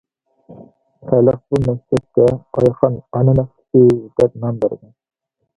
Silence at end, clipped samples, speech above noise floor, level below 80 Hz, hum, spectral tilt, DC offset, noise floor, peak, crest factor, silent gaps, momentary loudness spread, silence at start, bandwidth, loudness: 0.8 s; under 0.1%; 31 dB; -44 dBFS; none; -10 dB/octave; under 0.1%; -46 dBFS; 0 dBFS; 16 dB; none; 8 LU; 0.5 s; 10.5 kHz; -16 LUFS